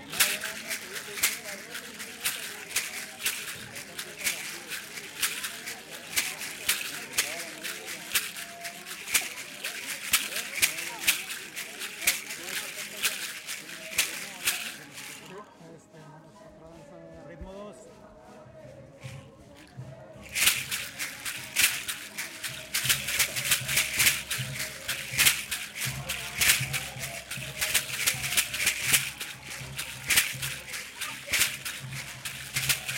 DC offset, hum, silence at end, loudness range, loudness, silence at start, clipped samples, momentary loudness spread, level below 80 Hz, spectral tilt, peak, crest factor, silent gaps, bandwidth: under 0.1%; none; 0 s; 12 LU; -28 LUFS; 0 s; under 0.1%; 18 LU; -58 dBFS; 0 dB/octave; -2 dBFS; 30 dB; none; 17 kHz